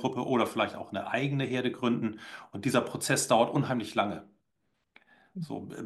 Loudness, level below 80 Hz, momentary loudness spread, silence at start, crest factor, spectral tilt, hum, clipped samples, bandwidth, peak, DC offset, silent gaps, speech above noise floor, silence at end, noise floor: -30 LUFS; -74 dBFS; 15 LU; 0 s; 20 dB; -4.5 dB/octave; none; under 0.1%; 12.5 kHz; -10 dBFS; under 0.1%; none; 49 dB; 0 s; -79 dBFS